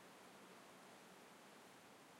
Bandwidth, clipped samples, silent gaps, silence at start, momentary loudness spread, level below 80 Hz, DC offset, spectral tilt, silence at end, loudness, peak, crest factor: 16 kHz; under 0.1%; none; 0 s; 1 LU; under -90 dBFS; under 0.1%; -3 dB/octave; 0 s; -62 LUFS; -50 dBFS; 14 dB